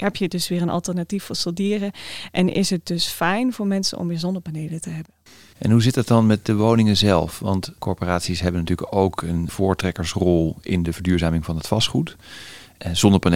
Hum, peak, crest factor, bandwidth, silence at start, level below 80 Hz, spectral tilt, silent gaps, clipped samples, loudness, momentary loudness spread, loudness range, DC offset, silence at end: none; 0 dBFS; 20 dB; 16.5 kHz; 0 s; -46 dBFS; -5.5 dB/octave; none; under 0.1%; -21 LUFS; 12 LU; 4 LU; 0.4%; 0 s